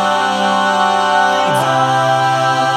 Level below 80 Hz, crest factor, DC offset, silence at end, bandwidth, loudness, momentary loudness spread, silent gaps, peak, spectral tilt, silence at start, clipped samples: -66 dBFS; 12 dB; under 0.1%; 0 s; 15.5 kHz; -13 LUFS; 1 LU; none; -2 dBFS; -4 dB/octave; 0 s; under 0.1%